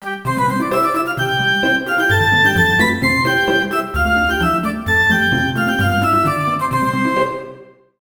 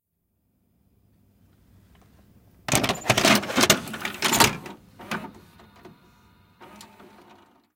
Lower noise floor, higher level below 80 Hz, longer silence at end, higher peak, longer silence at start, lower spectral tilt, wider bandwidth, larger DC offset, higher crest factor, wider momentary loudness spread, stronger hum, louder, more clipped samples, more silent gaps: second, -40 dBFS vs -73 dBFS; first, -36 dBFS vs -54 dBFS; second, 0.35 s vs 0.9 s; about the same, 0 dBFS vs 0 dBFS; second, 0 s vs 2.7 s; first, -5 dB/octave vs -2.5 dB/octave; first, over 20 kHz vs 17 kHz; neither; second, 16 dB vs 28 dB; second, 6 LU vs 20 LU; neither; first, -15 LUFS vs -21 LUFS; neither; neither